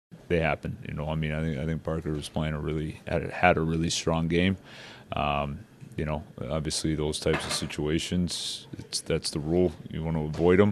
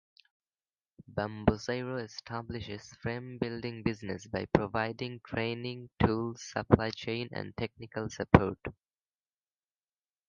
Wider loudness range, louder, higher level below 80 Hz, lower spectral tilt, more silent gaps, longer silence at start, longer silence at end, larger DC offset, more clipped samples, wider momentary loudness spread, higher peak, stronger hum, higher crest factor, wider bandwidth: about the same, 3 LU vs 5 LU; first, -29 LUFS vs -33 LUFS; about the same, -44 dBFS vs -48 dBFS; second, -5 dB/octave vs -6.5 dB/octave; neither; second, 0.1 s vs 1.1 s; second, 0 s vs 1.55 s; neither; neither; about the same, 11 LU vs 13 LU; about the same, -4 dBFS vs -2 dBFS; neither; second, 24 dB vs 32 dB; first, 14 kHz vs 7.4 kHz